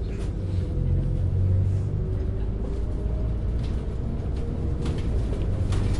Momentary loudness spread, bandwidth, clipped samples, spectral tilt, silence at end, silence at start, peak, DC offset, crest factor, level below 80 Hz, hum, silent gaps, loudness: 6 LU; 10.5 kHz; under 0.1%; -8.5 dB/octave; 0 s; 0 s; -12 dBFS; under 0.1%; 12 dB; -28 dBFS; none; none; -28 LUFS